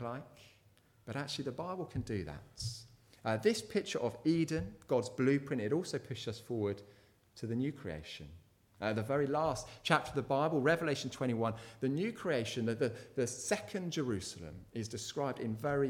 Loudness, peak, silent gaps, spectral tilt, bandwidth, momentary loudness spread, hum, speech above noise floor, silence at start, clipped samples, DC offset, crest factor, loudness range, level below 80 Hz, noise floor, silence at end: -36 LUFS; -12 dBFS; none; -5.5 dB/octave; 17 kHz; 12 LU; none; 31 dB; 0 s; under 0.1%; under 0.1%; 24 dB; 6 LU; -62 dBFS; -67 dBFS; 0 s